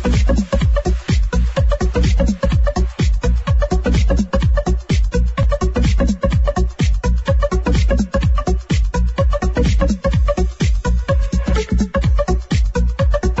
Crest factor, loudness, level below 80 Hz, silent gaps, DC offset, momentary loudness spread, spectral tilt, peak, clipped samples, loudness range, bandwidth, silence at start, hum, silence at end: 12 dB; -18 LUFS; -16 dBFS; none; under 0.1%; 2 LU; -7 dB/octave; -4 dBFS; under 0.1%; 1 LU; 8 kHz; 0 s; none; 0 s